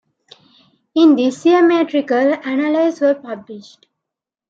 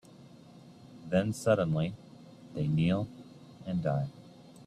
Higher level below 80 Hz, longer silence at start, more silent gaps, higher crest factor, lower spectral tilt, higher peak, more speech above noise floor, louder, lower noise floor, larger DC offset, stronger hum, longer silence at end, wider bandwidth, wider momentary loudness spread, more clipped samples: second, -72 dBFS vs -62 dBFS; first, 0.95 s vs 0.2 s; neither; second, 14 dB vs 20 dB; second, -5 dB/octave vs -7.5 dB/octave; first, -2 dBFS vs -14 dBFS; first, 69 dB vs 24 dB; first, -15 LUFS vs -31 LUFS; first, -83 dBFS vs -54 dBFS; neither; neither; first, 0.9 s vs 0.05 s; second, 7.8 kHz vs 13 kHz; second, 18 LU vs 24 LU; neither